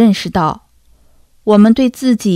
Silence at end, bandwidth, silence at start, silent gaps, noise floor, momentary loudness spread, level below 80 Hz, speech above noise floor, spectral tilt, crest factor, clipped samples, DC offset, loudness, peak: 0 s; 14 kHz; 0 s; none; -48 dBFS; 12 LU; -44 dBFS; 37 dB; -6.5 dB/octave; 12 dB; 0.4%; under 0.1%; -12 LUFS; 0 dBFS